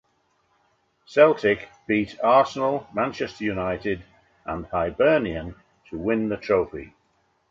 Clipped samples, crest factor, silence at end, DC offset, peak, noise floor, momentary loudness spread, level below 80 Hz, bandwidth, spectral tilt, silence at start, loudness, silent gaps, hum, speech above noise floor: under 0.1%; 20 dB; 0.65 s; under 0.1%; -4 dBFS; -68 dBFS; 15 LU; -50 dBFS; 7.6 kHz; -6.5 dB/octave; 1.1 s; -23 LUFS; none; none; 45 dB